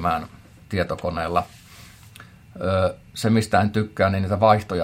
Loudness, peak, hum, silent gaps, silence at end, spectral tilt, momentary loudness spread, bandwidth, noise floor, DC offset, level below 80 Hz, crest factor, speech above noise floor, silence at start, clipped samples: -22 LUFS; -2 dBFS; none; none; 0 s; -6.5 dB/octave; 11 LU; 16 kHz; -46 dBFS; under 0.1%; -52 dBFS; 22 dB; 24 dB; 0 s; under 0.1%